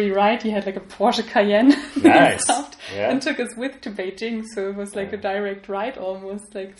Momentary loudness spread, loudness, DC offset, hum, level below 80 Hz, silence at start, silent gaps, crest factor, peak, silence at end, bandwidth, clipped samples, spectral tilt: 15 LU; -20 LUFS; under 0.1%; none; -58 dBFS; 0 s; none; 20 dB; -2 dBFS; 0.1 s; 11.5 kHz; under 0.1%; -4 dB/octave